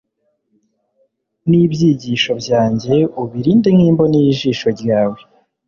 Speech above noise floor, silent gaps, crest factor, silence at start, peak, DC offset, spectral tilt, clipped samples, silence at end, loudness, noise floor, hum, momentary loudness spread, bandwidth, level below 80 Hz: 53 dB; none; 12 dB; 1.45 s; -2 dBFS; under 0.1%; -7 dB/octave; under 0.1%; 0.5 s; -14 LUFS; -66 dBFS; none; 8 LU; 7.2 kHz; -50 dBFS